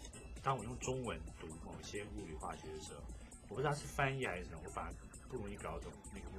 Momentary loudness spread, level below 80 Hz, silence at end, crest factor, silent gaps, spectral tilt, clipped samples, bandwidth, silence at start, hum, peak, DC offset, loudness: 13 LU; -54 dBFS; 0 s; 24 dB; none; -5 dB/octave; under 0.1%; 16 kHz; 0 s; none; -20 dBFS; under 0.1%; -44 LUFS